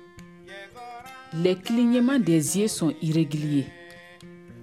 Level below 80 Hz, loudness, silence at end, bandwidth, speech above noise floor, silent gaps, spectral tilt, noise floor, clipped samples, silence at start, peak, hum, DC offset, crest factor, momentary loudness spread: -66 dBFS; -24 LUFS; 0 s; 16 kHz; 24 dB; none; -5.5 dB/octave; -47 dBFS; under 0.1%; 0.15 s; -8 dBFS; none; under 0.1%; 18 dB; 23 LU